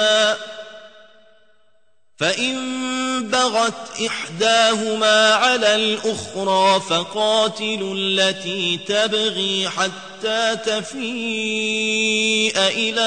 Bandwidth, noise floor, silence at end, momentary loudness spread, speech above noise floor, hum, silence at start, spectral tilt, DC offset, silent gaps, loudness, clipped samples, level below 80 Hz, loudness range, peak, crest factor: 9.6 kHz; -66 dBFS; 0 s; 9 LU; 47 dB; none; 0 s; -2 dB/octave; 0.2%; none; -18 LUFS; under 0.1%; -64 dBFS; 6 LU; -2 dBFS; 18 dB